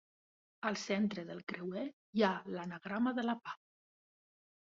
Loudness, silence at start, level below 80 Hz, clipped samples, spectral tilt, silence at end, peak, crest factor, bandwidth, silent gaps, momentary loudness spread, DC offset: -38 LUFS; 0.6 s; -80 dBFS; under 0.1%; -4.5 dB/octave; 1.1 s; -16 dBFS; 22 dB; 7.4 kHz; 1.43-1.47 s, 1.93-2.13 s; 10 LU; under 0.1%